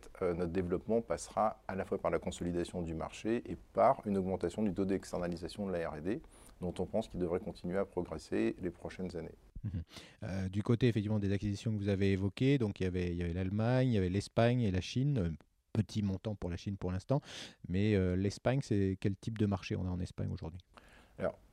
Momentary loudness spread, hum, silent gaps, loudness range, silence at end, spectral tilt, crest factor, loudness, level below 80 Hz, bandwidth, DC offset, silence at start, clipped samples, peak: 11 LU; none; none; 5 LU; 0.15 s; -7.5 dB/octave; 18 dB; -36 LUFS; -56 dBFS; 12 kHz; under 0.1%; 0.05 s; under 0.1%; -16 dBFS